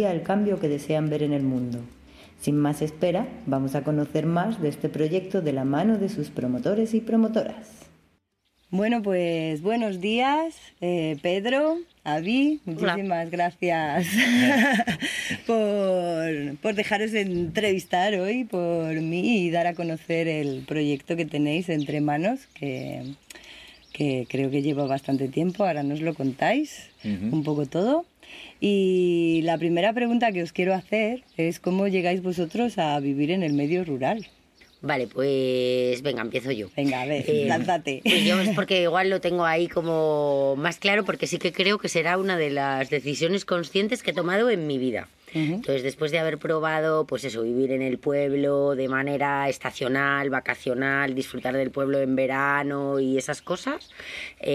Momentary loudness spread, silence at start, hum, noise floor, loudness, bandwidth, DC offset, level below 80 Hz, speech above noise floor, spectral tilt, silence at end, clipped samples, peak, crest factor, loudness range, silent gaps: 7 LU; 0 s; none; -69 dBFS; -25 LUFS; 15.5 kHz; under 0.1%; -60 dBFS; 45 dB; -5.5 dB/octave; 0 s; under 0.1%; -6 dBFS; 18 dB; 4 LU; none